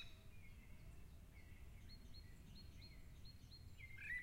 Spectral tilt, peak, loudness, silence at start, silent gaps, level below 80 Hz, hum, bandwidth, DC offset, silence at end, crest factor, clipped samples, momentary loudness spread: -4 dB/octave; -40 dBFS; -60 LUFS; 0 s; none; -62 dBFS; none; 16 kHz; under 0.1%; 0 s; 18 dB; under 0.1%; 5 LU